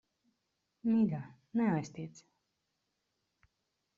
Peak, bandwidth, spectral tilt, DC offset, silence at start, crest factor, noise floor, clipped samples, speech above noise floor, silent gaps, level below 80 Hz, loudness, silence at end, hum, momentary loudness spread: -20 dBFS; 7.4 kHz; -8.5 dB/octave; under 0.1%; 0.85 s; 18 dB; -84 dBFS; under 0.1%; 51 dB; none; -76 dBFS; -34 LUFS; 1.8 s; none; 15 LU